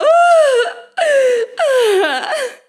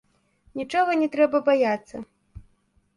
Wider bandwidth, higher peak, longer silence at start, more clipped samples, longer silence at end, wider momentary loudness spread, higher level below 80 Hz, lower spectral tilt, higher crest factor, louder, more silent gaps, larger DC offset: first, 13.5 kHz vs 11 kHz; first, 0 dBFS vs -6 dBFS; second, 0 s vs 0.55 s; neither; second, 0.15 s vs 0.55 s; second, 9 LU vs 19 LU; second, -80 dBFS vs -56 dBFS; second, 0 dB/octave vs -5.5 dB/octave; second, 12 dB vs 18 dB; first, -13 LUFS vs -22 LUFS; neither; neither